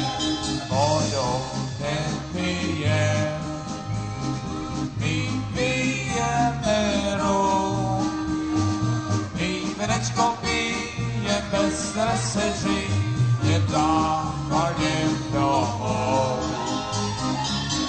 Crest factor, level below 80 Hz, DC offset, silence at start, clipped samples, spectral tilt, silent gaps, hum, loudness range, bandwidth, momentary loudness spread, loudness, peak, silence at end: 16 dB; -42 dBFS; under 0.1%; 0 s; under 0.1%; -5 dB/octave; none; none; 3 LU; 9.2 kHz; 6 LU; -24 LUFS; -8 dBFS; 0 s